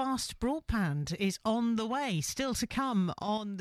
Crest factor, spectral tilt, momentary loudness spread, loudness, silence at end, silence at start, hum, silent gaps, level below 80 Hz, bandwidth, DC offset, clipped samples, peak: 12 dB; -5 dB/octave; 3 LU; -32 LUFS; 0 s; 0 s; none; none; -48 dBFS; 15.5 kHz; under 0.1%; under 0.1%; -20 dBFS